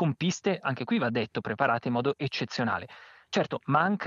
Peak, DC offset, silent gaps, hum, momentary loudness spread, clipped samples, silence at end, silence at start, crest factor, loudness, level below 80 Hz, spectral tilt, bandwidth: -8 dBFS; under 0.1%; none; none; 6 LU; under 0.1%; 0 s; 0 s; 20 dB; -29 LUFS; -72 dBFS; -5.5 dB/octave; 7.6 kHz